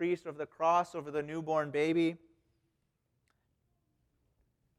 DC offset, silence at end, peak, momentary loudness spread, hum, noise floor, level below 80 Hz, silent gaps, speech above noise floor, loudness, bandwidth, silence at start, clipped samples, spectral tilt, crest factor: under 0.1%; 2.6 s; -18 dBFS; 8 LU; none; -80 dBFS; -76 dBFS; none; 47 dB; -33 LUFS; 11 kHz; 0 s; under 0.1%; -6.5 dB/octave; 18 dB